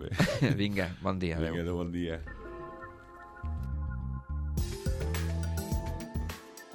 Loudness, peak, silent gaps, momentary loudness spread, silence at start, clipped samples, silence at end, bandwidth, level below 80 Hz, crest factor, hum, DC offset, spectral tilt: -34 LUFS; -12 dBFS; none; 15 LU; 0 s; under 0.1%; 0 s; 17.5 kHz; -40 dBFS; 20 dB; none; under 0.1%; -6 dB/octave